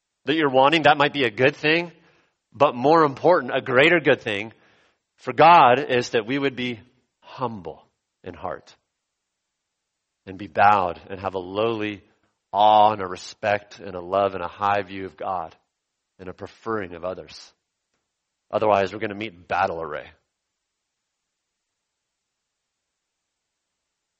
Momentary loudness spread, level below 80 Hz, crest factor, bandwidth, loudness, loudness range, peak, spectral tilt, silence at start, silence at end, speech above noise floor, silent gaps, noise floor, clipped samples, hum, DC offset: 21 LU; -62 dBFS; 22 dB; 8.4 kHz; -21 LUFS; 15 LU; -2 dBFS; -5.5 dB/octave; 0.25 s; 4.15 s; 59 dB; none; -80 dBFS; under 0.1%; none; under 0.1%